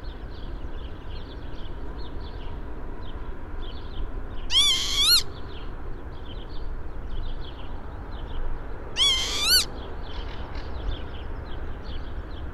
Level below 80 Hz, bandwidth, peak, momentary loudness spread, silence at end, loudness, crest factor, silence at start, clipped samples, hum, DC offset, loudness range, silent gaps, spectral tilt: -34 dBFS; 14.5 kHz; -8 dBFS; 21 LU; 0 s; -22 LUFS; 20 dB; 0 s; under 0.1%; none; under 0.1%; 15 LU; none; -1.5 dB/octave